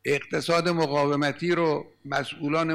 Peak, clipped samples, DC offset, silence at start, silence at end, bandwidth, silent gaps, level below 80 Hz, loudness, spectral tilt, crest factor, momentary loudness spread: -14 dBFS; under 0.1%; under 0.1%; 0.05 s; 0 s; 14.5 kHz; none; -64 dBFS; -25 LUFS; -5.5 dB/octave; 12 dB; 6 LU